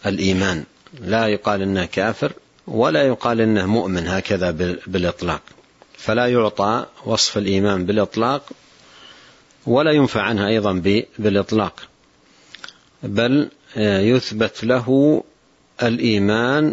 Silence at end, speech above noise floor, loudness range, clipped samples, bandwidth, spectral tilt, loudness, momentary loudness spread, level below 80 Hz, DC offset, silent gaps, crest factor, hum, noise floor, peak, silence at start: 0 s; 36 dB; 2 LU; under 0.1%; 8 kHz; -5.5 dB/octave; -19 LUFS; 10 LU; -50 dBFS; under 0.1%; none; 16 dB; none; -54 dBFS; -4 dBFS; 0 s